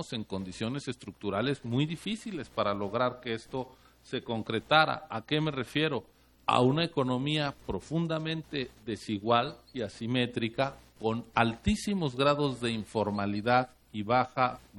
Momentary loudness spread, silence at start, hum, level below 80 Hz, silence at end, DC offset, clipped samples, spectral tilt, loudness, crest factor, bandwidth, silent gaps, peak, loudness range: 11 LU; 0 s; none; -54 dBFS; 0 s; under 0.1%; under 0.1%; -6 dB/octave; -31 LUFS; 24 dB; 13 kHz; none; -6 dBFS; 4 LU